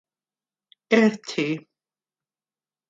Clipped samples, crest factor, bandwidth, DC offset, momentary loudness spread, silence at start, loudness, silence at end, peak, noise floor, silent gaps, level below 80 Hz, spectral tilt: under 0.1%; 22 dB; 7.8 kHz; under 0.1%; 9 LU; 0.9 s; -23 LUFS; 1.3 s; -4 dBFS; under -90 dBFS; none; -76 dBFS; -5.5 dB/octave